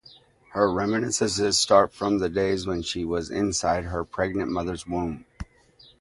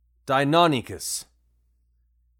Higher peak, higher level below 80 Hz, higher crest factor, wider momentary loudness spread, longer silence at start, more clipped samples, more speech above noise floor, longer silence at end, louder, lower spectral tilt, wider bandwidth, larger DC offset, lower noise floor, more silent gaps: about the same, -4 dBFS vs -4 dBFS; first, -46 dBFS vs -60 dBFS; about the same, 22 dB vs 22 dB; about the same, 13 LU vs 11 LU; first, 0.5 s vs 0.25 s; neither; second, 31 dB vs 43 dB; second, 0.6 s vs 1.2 s; about the same, -25 LUFS vs -23 LUFS; about the same, -4 dB/octave vs -4 dB/octave; second, 11.5 kHz vs 18.5 kHz; neither; second, -56 dBFS vs -66 dBFS; neither